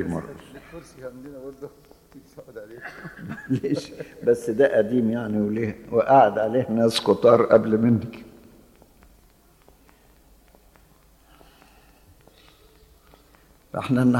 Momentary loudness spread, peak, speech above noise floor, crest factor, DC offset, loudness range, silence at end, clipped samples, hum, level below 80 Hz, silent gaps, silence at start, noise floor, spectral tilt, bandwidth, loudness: 25 LU; -4 dBFS; 34 dB; 20 dB; under 0.1%; 16 LU; 0 s; under 0.1%; none; -58 dBFS; none; 0 s; -56 dBFS; -7 dB/octave; 16.5 kHz; -21 LUFS